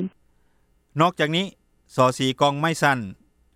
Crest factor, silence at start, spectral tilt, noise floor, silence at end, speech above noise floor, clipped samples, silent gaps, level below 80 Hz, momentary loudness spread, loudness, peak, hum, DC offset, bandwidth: 20 dB; 0 s; -5 dB/octave; -63 dBFS; 0.45 s; 41 dB; under 0.1%; none; -62 dBFS; 13 LU; -22 LUFS; -4 dBFS; none; under 0.1%; 16 kHz